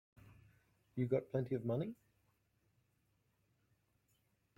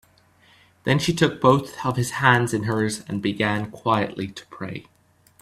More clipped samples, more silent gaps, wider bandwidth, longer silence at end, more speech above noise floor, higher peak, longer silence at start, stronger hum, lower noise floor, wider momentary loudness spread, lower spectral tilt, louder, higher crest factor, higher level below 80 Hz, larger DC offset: neither; neither; second, 6 kHz vs 14.5 kHz; first, 2.65 s vs 0.6 s; first, 41 dB vs 35 dB; second, -24 dBFS vs 0 dBFS; second, 0.25 s vs 0.85 s; neither; first, -80 dBFS vs -57 dBFS; second, 11 LU vs 16 LU; first, -10 dB/octave vs -5.5 dB/octave; second, -41 LUFS vs -22 LUFS; about the same, 22 dB vs 22 dB; second, -76 dBFS vs -56 dBFS; neither